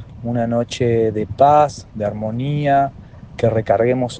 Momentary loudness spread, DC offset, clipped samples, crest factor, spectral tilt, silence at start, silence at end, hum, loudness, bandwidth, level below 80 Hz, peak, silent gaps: 11 LU; under 0.1%; under 0.1%; 16 dB; -7 dB/octave; 0 s; 0 s; none; -18 LUFS; 9.2 kHz; -46 dBFS; 0 dBFS; none